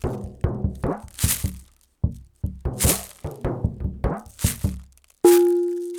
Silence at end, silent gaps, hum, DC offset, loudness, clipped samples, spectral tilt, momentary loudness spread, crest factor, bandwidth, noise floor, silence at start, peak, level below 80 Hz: 0 s; none; none; under 0.1%; -24 LUFS; under 0.1%; -5.5 dB/octave; 14 LU; 20 dB; over 20 kHz; -45 dBFS; 0.05 s; -2 dBFS; -34 dBFS